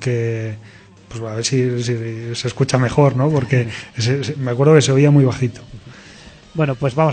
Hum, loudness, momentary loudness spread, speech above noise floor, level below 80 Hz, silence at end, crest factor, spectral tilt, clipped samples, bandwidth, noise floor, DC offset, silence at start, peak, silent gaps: none; -17 LUFS; 15 LU; 25 dB; -48 dBFS; 0 s; 18 dB; -6 dB/octave; under 0.1%; 9.2 kHz; -41 dBFS; under 0.1%; 0 s; 0 dBFS; none